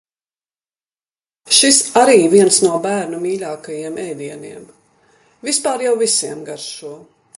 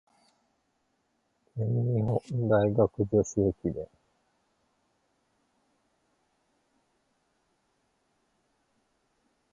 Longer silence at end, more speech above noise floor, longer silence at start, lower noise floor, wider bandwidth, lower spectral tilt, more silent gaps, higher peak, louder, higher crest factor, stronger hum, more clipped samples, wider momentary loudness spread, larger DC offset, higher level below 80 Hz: second, 0.4 s vs 5.65 s; first, over 74 dB vs 48 dB; about the same, 1.45 s vs 1.55 s; first, under -90 dBFS vs -75 dBFS; first, 11.5 kHz vs 7.6 kHz; second, -2.5 dB/octave vs -8.5 dB/octave; neither; first, 0 dBFS vs -10 dBFS; first, -14 LUFS vs -28 LUFS; about the same, 18 dB vs 22 dB; neither; neither; first, 19 LU vs 12 LU; neither; second, -64 dBFS vs -56 dBFS